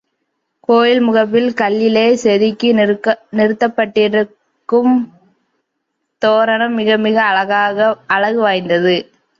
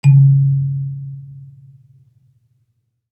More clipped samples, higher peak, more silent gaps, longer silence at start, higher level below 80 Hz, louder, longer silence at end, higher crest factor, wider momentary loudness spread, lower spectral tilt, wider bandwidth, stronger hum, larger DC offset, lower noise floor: neither; about the same, 0 dBFS vs -2 dBFS; neither; first, 0.7 s vs 0.05 s; about the same, -62 dBFS vs -66 dBFS; about the same, -14 LUFS vs -14 LUFS; second, 0.35 s vs 1.65 s; about the same, 14 dB vs 14 dB; second, 5 LU vs 26 LU; second, -5.5 dB/octave vs -9.5 dB/octave; second, 7.6 kHz vs 8.4 kHz; neither; neither; first, -72 dBFS vs -66 dBFS